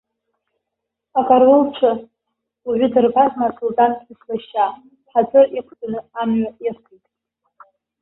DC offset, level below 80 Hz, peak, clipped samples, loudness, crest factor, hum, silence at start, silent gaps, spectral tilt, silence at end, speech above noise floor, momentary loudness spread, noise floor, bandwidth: under 0.1%; -60 dBFS; -2 dBFS; under 0.1%; -17 LUFS; 18 dB; none; 1.15 s; none; -10.5 dB/octave; 1.3 s; 64 dB; 15 LU; -80 dBFS; 4 kHz